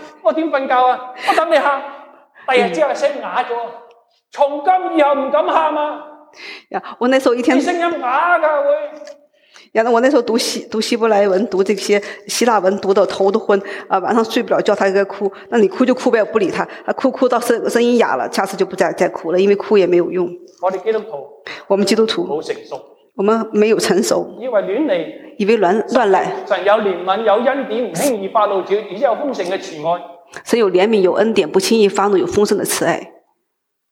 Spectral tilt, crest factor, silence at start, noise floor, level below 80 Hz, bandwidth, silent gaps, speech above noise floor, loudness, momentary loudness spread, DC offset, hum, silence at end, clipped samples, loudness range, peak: -4 dB/octave; 14 dB; 0 s; -73 dBFS; -64 dBFS; 16.5 kHz; none; 57 dB; -16 LUFS; 9 LU; under 0.1%; none; 0.8 s; under 0.1%; 2 LU; -2 dBFS